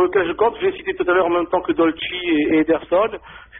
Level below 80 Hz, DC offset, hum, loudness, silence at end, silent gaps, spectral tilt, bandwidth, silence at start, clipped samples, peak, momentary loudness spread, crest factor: -50 dBFS; under 0.1%; none; -19 LUFS; 0 s; none; -3 dB/octave; 3.9 kHz; 0 s; under 0.1%; -6 dBFS; 6 LU; 12 dB